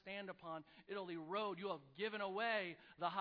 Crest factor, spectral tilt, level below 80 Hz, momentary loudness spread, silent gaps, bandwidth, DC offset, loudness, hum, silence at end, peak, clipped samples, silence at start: 18 dB; -2 dB/octave; -86 dBFS; 11 LU; none; 5.2 kHz; under 0.1%; -45 LUFS; none; 0 s; -28 dBFS; under 0.1%; 0.05 s